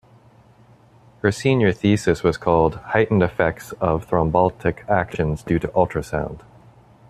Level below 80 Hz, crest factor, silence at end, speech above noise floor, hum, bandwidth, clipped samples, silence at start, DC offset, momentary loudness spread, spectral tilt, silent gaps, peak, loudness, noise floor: -42 dBFS; 18 dB; 0.7 s; 32 dB; none; 14 kHz; under 0.1%; 1.25 s; under 0.1%; 7 LU; -7 dB/octave; none; -2 dBFS; -20 LUFS; -51 dBFS